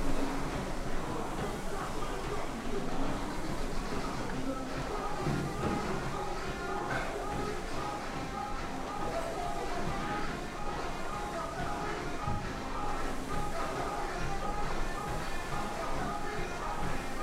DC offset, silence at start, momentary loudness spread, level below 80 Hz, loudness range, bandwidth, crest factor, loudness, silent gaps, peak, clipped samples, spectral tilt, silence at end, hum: under 0.1%; 0 s; 3 LU; -40 dBFS; 2 LU; 14.5 kHz; 14 dB; -37 LUFS; none; -18 dBFS; under 0.1%; -5 dB/octave; 0 s; none